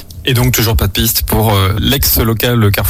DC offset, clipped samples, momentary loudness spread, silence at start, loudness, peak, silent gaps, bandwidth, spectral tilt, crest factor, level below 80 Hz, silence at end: under 0.1%; under 0.1%; 2 LU; 0 s; -11 LUFS; 0 dBFS; none; 17.5 kHz; -4.5 dB/octave; 10 dB; -22 dBFS; 0 s